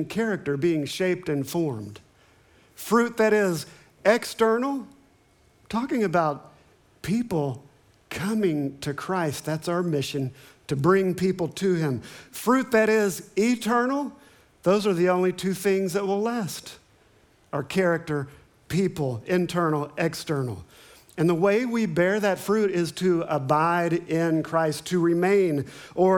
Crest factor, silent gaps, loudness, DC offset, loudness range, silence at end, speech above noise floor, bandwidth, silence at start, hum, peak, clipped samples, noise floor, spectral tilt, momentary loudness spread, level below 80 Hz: 18 dB; none; -25 LUFS; under 0.1%; 5 LU; 0 s; 36 dB; 19.5 kHz; 0 s; none; -6 dBFS; under 0.1%; -60 dBFS; -6 dB/octave; 12 LU; -62 dBFS